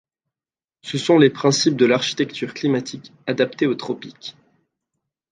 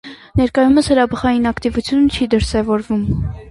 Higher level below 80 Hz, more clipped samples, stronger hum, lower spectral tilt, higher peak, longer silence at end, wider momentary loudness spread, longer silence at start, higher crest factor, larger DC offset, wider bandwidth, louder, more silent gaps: second, -68 dBFS vs -32 dBFS; neither; neither; second, -4.5 dB/octave vs -6.5 dB/octave; about the same, -2 dBFS vs -2 dBFS; first, 1 s vs 0 s; first, 19 LU vs 7 LU; first, 0.85 s vs 0.05 s; first, 20 dB vs 14 dB; neither; second, 9.6 kHz vs 11.5 kHz; second, -19 LUFS vs -16 LUFS; neither